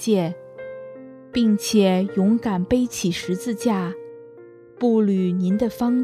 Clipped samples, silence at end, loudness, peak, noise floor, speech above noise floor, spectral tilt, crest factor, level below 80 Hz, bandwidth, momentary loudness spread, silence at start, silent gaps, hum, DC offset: under 0.1%; 0 s; -21 LUFS; -6 dBFS; -44 dBFS; 25 dB; -6 dB/octave; 16 dB; -52 dBFS; 14 kHz; 18 LU; 0 s; none; none; under 0.1%